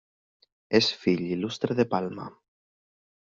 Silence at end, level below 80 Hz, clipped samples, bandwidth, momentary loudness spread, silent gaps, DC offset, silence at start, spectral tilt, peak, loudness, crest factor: 0.95 s; -66 dBFS; under 0.1%; 7.6 kHz; 13 LU; none; under 0.1%; 0.7 s; -4 dB/octave; -8 dBFS; -26 LUFS; 22 dB